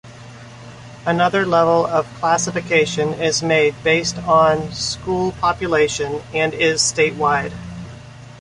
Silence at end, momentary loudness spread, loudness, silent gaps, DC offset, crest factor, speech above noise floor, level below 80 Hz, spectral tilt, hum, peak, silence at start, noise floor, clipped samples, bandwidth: 0 s; 20 LU; -17 LUFS; none; under 0.1%; 16 dB; 20 dB; -46 dBFS; -3.5 dB/octave; none; -2 dBFS; 0.05 s; -38 dBFS; under 0.1%; 11.5 kHz